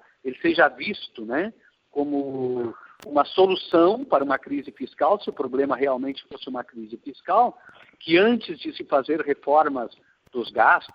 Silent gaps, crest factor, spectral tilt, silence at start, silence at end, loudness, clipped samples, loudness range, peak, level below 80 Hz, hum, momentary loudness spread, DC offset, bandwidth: none; 20 dB; -7 dB/octave; 0.25 s; 0.1 s; -23 LUFS; under 0.1%; 3 LU; -4 dBFS; -68 dBFS; none; 16 LU; under 0.1%; 5.6 kHz